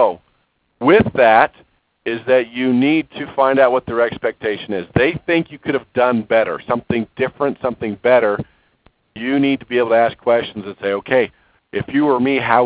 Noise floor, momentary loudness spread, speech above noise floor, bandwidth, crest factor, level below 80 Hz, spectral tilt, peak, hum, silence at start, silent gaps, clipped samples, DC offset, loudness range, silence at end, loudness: -64 dBFS; 11 LU; 47 dB; 4 kHz; 16 dB; -48 dBFS; -10 dB/octave; 0 dBFS; none; 0 s; none; under 0.1%; under 0.1%; 3 LU; 0 s; -17 LUFS